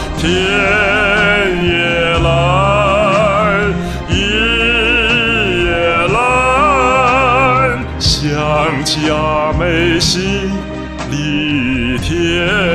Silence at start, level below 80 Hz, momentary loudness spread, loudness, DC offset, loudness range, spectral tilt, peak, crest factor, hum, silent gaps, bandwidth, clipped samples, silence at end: 0 s; -26 dBFS; 6 LU; -12 LUFS; under 0.1%; 4 LU; -4.5 dB/octave; 0 dBFS; 12 dB; none; none; 14 kHz; under 0.1%; 0 s